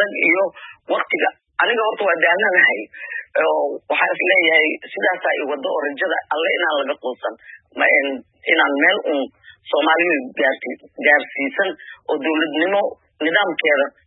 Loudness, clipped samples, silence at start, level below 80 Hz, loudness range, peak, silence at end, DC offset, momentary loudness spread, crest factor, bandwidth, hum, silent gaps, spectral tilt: -18 LUFS; under 0.1%; 0 s; -74 dBFS; 3 LU; -2 dBFS; 0.15 s; under 0.1%; 12 LU; 18 dB; 4.1 kHz; none; none; -8 dB/octave